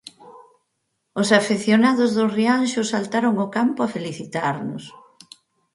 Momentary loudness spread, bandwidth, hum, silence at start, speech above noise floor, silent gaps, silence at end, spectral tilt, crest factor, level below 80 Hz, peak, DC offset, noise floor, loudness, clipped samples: 12 LU; 11.5 kHz; none; 0.2 s; 54 dB; none; 0.75 s; -5 dB/octave; 22 dB; -68 dBFS; 0 dBFS; under 0.1%; -74 dBFS; -20 LUFS; under 0.1%